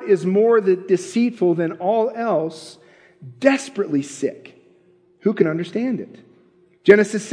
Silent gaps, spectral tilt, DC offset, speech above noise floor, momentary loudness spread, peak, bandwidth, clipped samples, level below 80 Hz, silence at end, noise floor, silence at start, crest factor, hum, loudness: none; -6 dB/octave; under 0.1%; 37 dB; 12 LU; 0 dBFS; 10.5 kHz; under 0.1%; -72 dBFS; 0 s; -56 dBFS; 0 s; 20 dB; none; -19 LUFS